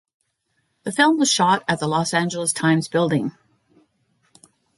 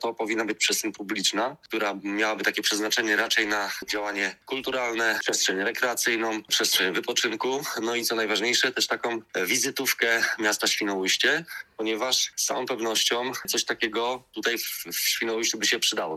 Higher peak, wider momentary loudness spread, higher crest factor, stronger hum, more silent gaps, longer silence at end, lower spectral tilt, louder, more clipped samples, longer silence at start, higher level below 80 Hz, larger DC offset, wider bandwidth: about the same, -4 dBFS vs -6 dBFS; about the same, 9 LU vs 7 LU; about the same, 18 dB vs 20 dB; neither; neither; first, 1.45 s vs 0 s; first, -4 dB/octave vs -0.5 dB/octave; first, -20 LUFS vs -25 LUFS; neither; first, 0.85 s vs 0 s; first, -64 dBFS vs -70 dBFS; neither; second, 11.5 kHz vs 17 kHz